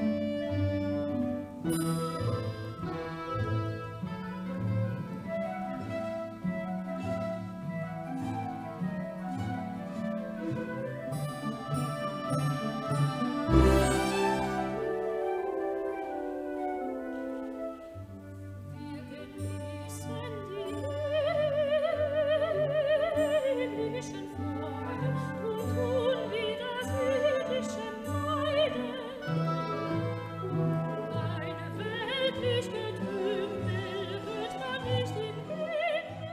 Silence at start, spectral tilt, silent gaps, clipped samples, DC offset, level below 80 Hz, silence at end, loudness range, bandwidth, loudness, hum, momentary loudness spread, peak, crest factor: 0 s; -6.5 dB/octave; none; under 0.1%; under 0.1%; -46 dBFS; 0 s; 7 LU; 15.5 kHz; -32 LUFS; none; 10 LU; -8 dBFS; 24 dB